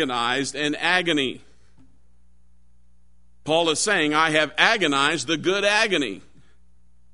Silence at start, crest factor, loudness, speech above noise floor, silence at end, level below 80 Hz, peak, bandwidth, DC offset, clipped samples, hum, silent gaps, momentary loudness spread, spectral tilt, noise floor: 0 s; 24 dB; -21 LUFS; 38 dB; 0.95 s; -60 dBFS; 0 dBFS; 11 kHz; 0.5%; under 0.1%; 60 Hz at -60 dBFS; none; 9 LU; -2.5 dB/octave; -60 dBFS